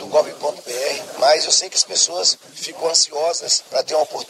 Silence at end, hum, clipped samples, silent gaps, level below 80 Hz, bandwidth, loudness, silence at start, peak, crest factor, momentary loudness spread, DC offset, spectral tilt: 0.05 s; none; under 0.1%; none; -76 dBFS; 15 kHz; -18 LUFS; 0 s; 0 dBFS; 20 dB; 10 LU; under 0.1%; 1 dB/octave